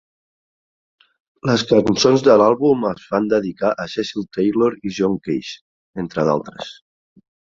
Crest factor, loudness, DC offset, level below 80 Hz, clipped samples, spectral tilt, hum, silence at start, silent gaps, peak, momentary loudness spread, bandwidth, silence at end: 18 dB; -18 LUFS; under 0.1%; -54 dBFS; under 0.1%; -5.5 dB/octave; none; 1.45 s; 5.61-5.93 s; -2 dBFS; 18 LU; 7.6 kHz; 0.75 s